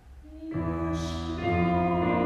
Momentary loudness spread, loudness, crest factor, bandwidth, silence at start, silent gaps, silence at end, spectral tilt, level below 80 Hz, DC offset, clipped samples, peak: 13 LU; -28 LUFS; 16 dB; 9.6 kHz; 0.05 s; none; 0 s; -7.5 dB/octave; -46 dBFS; under 0.1%; under 0.1%; -12 dBFS